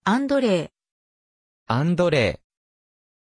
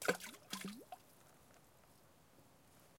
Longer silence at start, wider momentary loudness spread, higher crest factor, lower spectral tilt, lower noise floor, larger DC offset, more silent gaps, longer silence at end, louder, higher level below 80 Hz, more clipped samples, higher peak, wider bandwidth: about the same, 0.05 s vs 0 s; second, 11 LU vs 20 LU; second, 18 dB vs 30 dB; first, -6.5 dB/octave vs -3 dB/octave; first, under -90 dBFS vs -68 dBFS; neither; first, 0.91-1.66 s vs none; first, 0.95 s vs 0 s; first, -22 LUFS vs -48 LUFS; first, -52 dBFS vs -82 dBFS; neither; first, -6 dBFS vs -20 dBFS; second, 10.5 kHz vs 16.5 kHz